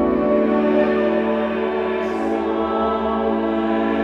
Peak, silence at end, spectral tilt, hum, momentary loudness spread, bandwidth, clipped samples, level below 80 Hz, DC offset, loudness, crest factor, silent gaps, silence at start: -4 dBFS; 0 s; -7.5 dB/octave; none; 4 LU; 7.2 kHz; under 0.1%; -44 dBFS; under 0.1%; -20 LUFS; 14 dB; none; 0 s